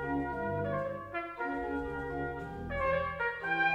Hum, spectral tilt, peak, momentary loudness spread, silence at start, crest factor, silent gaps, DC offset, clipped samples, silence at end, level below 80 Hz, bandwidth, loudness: none; -7.5 dB/octave; -18 dBFS; 7 LU; 0 s; 16 dB; none; under 0.1%; under 0.1%; 0 s; -52 dBFS; 12 kHz; -35 LUFS